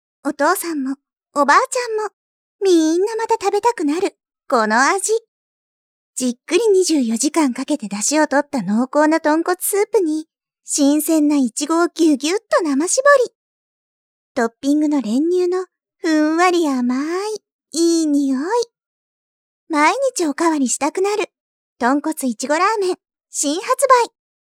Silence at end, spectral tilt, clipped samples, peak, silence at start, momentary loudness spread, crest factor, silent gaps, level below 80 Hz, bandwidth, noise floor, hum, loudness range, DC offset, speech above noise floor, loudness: 0.4 s; -3 dB/octave; under 0.1%; 0 dBFS; 0.25 s; 10 LU; 18 dB; 2.13-2.59 s, 5.28-6.13 s, 13.35-14.35 s, 17.52-17.59 s, 18.86-19.67 s, 21.40-21.76 s; -74 dBFS; 16 kHz; under -90 dBFS; none; 3 LU; under 0.1%; over 73 dB; -18 LUFS